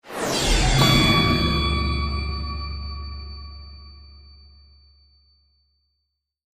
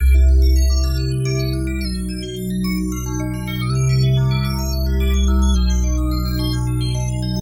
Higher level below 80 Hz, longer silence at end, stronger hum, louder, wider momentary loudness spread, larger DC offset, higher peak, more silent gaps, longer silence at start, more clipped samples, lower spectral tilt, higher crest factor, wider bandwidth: second, -30 dBFS vs -18 dBFS; first, 2.35 s vs 0 s; neither; about the same, -21 LUFS vs -19 LUFS; first, 23 LU vs 8 LU; neither; first, -2 dBFS vs -6 dBFS; neither; about the same, 0.05 s vs 0 s; neither; second, -4 dB/octave vs -6 dB/octave; first, 22 dB vs 10 dB; about the same, 15.5 kHz vs 16.5 kHz